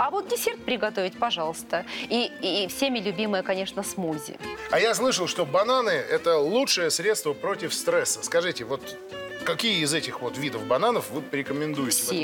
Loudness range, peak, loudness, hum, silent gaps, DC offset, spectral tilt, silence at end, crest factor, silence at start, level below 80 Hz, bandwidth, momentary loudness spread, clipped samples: 4 LU; -12 dBFS; -26 LUFS; none; none; under 0.1%; -2.5 dB/octave; 0 s; 14 dB; 0 s; -64 dBFS; 17.5 kHz; 9 LU; under 0.1%